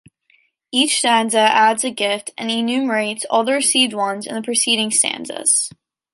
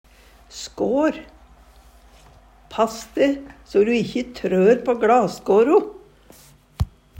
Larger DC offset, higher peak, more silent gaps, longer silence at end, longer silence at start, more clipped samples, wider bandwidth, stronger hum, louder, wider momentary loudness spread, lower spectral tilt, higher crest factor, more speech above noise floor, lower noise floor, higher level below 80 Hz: neither; about the same, -2 dBFS vs -4 dBFS; neither; about the same, 0.45 s vs 0.35 s; first, 0.75 s vs 0.55 s; neither; second, 12 kHz vs 16 kHz; neither; first, -17 LUFS vs -20 LUFS; second, 8 LU vs 17 LU; second, -1 dB/octave vs -6 dB/octave; about the same, 16 dB vs 18 dB; first, 42 dB vs 30 dB; first, -60 dBFS vs -49 dBFS; second, -72 dBFS vs -44 dBFS